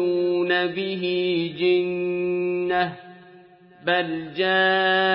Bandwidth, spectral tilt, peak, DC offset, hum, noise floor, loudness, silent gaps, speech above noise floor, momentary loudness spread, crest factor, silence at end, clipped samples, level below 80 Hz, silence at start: 5.4 kHz; -9.5 dB/octave; -8 dBFS; under 0.1%; none; -50 dBFS; -22 LUFS; none; 27 dB; 7 LU; 16 dB; 0 s; under 0.1%; -68 dBFS; 0 s